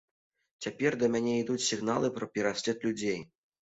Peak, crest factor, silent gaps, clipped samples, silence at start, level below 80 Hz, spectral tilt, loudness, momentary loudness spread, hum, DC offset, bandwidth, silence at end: -14 dBFS; 18 dB; none; under 0.1%; 0.6 s; -68 dBFS; -4 dB/octave; -31 LUFS; 7 LU; none; under 0.1%; 8.2 kHz; 0.35 s